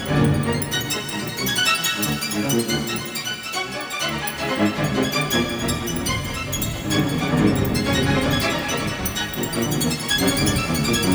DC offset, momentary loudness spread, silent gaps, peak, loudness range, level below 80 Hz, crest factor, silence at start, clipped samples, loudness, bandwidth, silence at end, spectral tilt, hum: under 0.1%; 6 LU; none; -6 dBFS; 2 LU; -38 dBFS; 16 dB; 0 s; under 0.1%; -21 LUFS; over 20 kHz; 0 s; -4 dB/octave; none